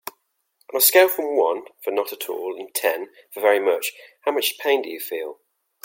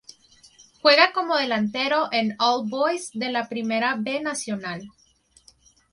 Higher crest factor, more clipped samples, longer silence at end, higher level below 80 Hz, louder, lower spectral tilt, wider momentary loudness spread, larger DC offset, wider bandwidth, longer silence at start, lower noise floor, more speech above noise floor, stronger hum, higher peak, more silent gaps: about the same, 20 dB vs 22 dB; neither; second, 0.5 s vs 1.05 s; second, -82 dBFS vs -70 dBFS; about the same, -21 LUFS vs -22 LUFS; second, 0 dB/octave vs -3 dB/octave; about the same, 14 LU vs 12 LU; neither; first, 17 kHz vs 11.5 kHz; second, 0.05 s vs 0.85 s; first, -67 dBFS vs -57 dBFS; first, 45 dB vs 34 dB; neither; about the same, -2 dBFS vs -2 dBFS; neither